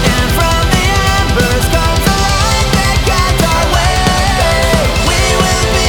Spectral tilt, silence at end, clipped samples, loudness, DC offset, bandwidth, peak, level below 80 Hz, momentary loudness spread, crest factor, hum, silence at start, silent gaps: -4 dB/octave; 0 s; under 0.1%; -11 LUFS; under 0.1%; over 20 kHz; 0 dBFS; -16 dBFS; 1 LU; 10 dB; none; 0 s; none